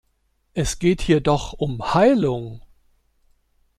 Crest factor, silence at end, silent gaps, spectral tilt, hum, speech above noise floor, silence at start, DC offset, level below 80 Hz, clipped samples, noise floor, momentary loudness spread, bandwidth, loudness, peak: 18 dB; 1.2 s; none; -6 dB/octave; none; 48 dB; 0.55 s; under 0.1%; -38 dBFS; under 0.1%; -67 dBFS; 13 LU; 14 kHz; -20 LUFS; -4 dBFS